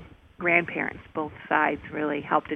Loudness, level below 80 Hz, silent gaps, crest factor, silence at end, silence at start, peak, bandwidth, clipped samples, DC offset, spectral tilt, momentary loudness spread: -26 LUFS; -58 dBFS; none; 22 dB; 0 s; 0 s; -6 dBFS; 6 kHz; under 0.1%; under 0.1%; -8 dB/octave; 11 LU